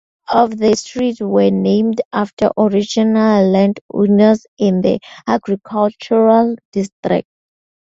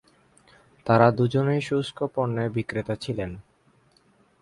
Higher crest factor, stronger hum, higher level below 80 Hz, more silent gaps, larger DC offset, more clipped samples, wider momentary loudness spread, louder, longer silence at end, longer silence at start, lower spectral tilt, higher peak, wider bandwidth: second, 14 dB vs 22 dB; neither; about the same, -54 dBFS vs -54 dBFS; first, 2.05-2.11 s, 2.33-2.37 s, 3.81-3.89 s, 4.48-4.57 s, 6.65-6.72 s, 6.92-7.03 s vs none; neither; neither; second, 8 LU vs 14 LU; first, -15 LUFS vs -25 LUFS; second, 0.75 s vs 1 s; second, 0.3 s vs 0.85 s; about the same, -6.5 dB/octave vs -7.5 dB/octave; about the same, 0 dBFS vs -2 dBFS; second, 7.8 kHz vs 11.5 kHz